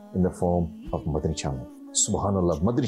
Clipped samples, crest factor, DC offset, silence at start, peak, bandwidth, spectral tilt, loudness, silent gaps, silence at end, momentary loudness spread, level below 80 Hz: under 0.1%; 14 dB; under 0.1%; 0 s; -12 dBFS; 12.5 kHz; -5.5 dB/octave; -26 LUFS; none; 0 s; 9 LU; -44 dBFS